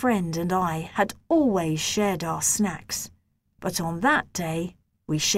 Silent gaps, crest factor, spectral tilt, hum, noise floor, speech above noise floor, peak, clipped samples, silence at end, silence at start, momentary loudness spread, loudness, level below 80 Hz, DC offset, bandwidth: none; 18 dB; -3.5 dB/octave; none; -51 dBFS; 26 dB; -8 dBFS; under 0.1%; 0 s; 0 s; 9 LU; -25 LUFS; -54 dBFS; under 0.1%; 16 kHz